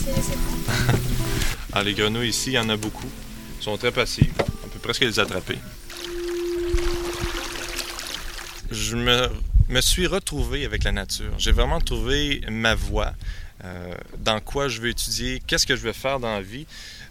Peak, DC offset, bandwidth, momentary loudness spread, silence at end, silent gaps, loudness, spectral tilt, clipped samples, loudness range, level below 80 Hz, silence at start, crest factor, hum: -2 dBFS; 0.2%; 18.5 kHz; 14 LU; 0 s; none; -24 LUFS; -3.5 dB/octave; under 0.1%; 3 LU; -28 dBFS; 0 s; 22 dB; none